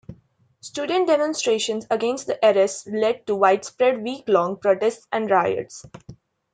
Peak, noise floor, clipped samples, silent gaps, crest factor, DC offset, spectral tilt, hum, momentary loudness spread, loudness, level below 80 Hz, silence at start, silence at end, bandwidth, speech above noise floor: -2 dBFS; -58 dBFS; under 0.1%; none; 20 dB; under 0.1%; -3.5 dB/octave; none; 10 LU; -21 LUFS; -64 dBFS; 0.1 s; 0.4 s; 9.6 kHz; 37 dB